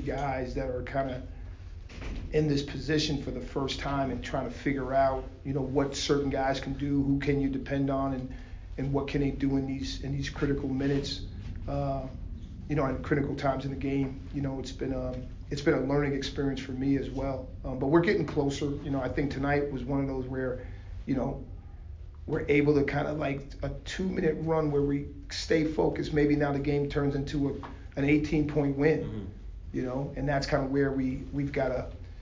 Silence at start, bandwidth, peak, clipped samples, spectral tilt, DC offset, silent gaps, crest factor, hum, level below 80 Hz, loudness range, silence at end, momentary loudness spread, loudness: 0 s; 7.6 kHz; -10 dBFS; under 0.1%; -6.5 dB/octave; under 0.1%; none; 20 dB; none; -42 dBFS; 4 LU; 0 s; 13 LU; -30 LUFS